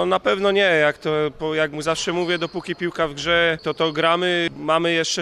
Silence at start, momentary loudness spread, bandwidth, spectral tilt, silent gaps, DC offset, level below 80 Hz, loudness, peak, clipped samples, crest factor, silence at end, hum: 0 s; 6 LU; 12.5 kHz; -4 dB/octave; none; under 0.1%; -52 dBFS; -20 LUFS; -4 dBFS; under 0.1%; 16 dB; 0 s; none